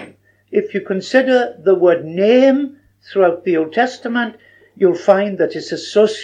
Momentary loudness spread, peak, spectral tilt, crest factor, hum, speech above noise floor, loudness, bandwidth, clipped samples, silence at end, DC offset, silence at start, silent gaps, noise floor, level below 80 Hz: 9 LU; 0 dBFS; -5.5 dB/octave; 16 dB; none; 27 dB; -16 LUFS; 9.4 kHz; under 0.1%; 0 s; under 0.1%; 0 s; none; -42 dBFS; -70 dBFS